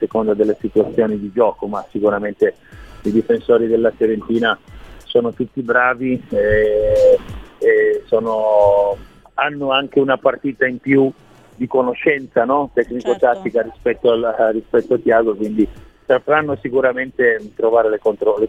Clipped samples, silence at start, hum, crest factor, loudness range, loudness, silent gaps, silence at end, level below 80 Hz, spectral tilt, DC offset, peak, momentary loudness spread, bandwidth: under 0.1%; 0 s; none; 16 dB; 3 LU; -17 LUFS; none; 0 s; -42 dBFS; -7 dB/octave; 0.1%; 0 dBFS; 7 LU; 8 kHz